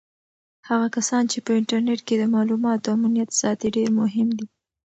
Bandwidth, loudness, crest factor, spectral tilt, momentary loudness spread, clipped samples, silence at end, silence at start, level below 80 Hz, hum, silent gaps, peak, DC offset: 8.2 kHz; -22 LUFS; 14 dB; -4.5 dB/octave; 3 LU; under 0.1%; 0.5 s; 0.65 s; -66 dBFS; none; none; -8 dBFS; under 0.1%